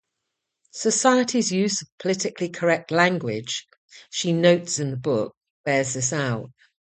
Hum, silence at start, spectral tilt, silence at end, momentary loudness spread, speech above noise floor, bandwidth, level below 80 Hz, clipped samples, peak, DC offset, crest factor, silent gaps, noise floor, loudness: none; 0.75 s; -4 dB/octave; 0.5 s; 12 LU; 58 dB; 9.4 kHz; -66 dBFS; under 0.1%; -4 dBFS; under 0.1%; 20 dB; 1.92-1.98 s, 3.77-3.88 s, 5.37-5.41 s, 5.50-5.64 s; -81 dBFS; -23 LUFS